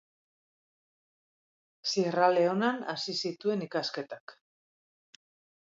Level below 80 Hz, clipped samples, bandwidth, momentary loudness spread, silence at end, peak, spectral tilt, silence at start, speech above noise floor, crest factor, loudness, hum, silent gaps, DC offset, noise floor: -86 dBFS; under 0.1%; 7.8 kHz; 13 LU; 1.35 s; -12 dBFS; -4.5 dB/octave; 1.85 s; over 60 dB; 22 dB; -30 LUFS; none; 4.20-4.27 s; under 0.1%; under -90 dBFS